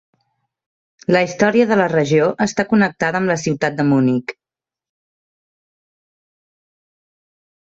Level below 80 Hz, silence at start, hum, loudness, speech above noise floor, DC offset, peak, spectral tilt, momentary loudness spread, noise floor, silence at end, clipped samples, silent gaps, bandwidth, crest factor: -58 dBFS; 1.1 s; none; -16 LUFS; 73 dB; under 0.1%; -2 dBFS; -6 dB/octave; 5 LU; -89 dBFS; 3.4 s; under 0.1%; none; 8 kHz; 18 dB